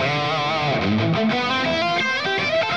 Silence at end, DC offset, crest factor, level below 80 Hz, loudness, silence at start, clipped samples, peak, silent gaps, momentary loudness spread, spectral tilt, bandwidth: 0 s; 0.3%; 12 dB; -52 dBFS; -20 LUFS; 0 s; under 0.1%; -10 dBFS; none; 1 LU; -5 dB/octave; 9.2 kHz